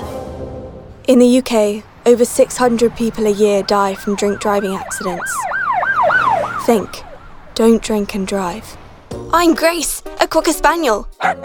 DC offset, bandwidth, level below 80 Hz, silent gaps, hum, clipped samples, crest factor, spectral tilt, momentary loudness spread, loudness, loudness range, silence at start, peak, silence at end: 0.2%; over 20 kHz; -38 dBFS; none; none; under 0.1%; 16 dB; -4 dB/octave; 15 LU; -15 LUFS; 3 LU; 0 s; 0 dBFS; 0 s